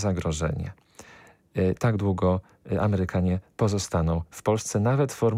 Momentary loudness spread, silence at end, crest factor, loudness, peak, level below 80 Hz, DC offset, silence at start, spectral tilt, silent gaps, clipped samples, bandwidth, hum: 6 LU; 0 s; 14 dB; -26 LUFS; -12 dBFS; -44 dBFS; under 0.1%; 0 s; -6.5 dB/octave; none; under 0.1%; 15 kHz; none